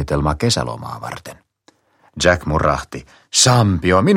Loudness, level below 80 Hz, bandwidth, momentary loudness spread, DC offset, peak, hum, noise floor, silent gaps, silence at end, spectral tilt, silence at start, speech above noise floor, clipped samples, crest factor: -16 LUFS; -34 dBFS; 16.5 kHz; 18 LU; under 0.1%; 0 dBFS; none; -57 dBFS; none; 0 s; -4 dB/octave; 0 s; 40 dB; under 0.1%; 18 dB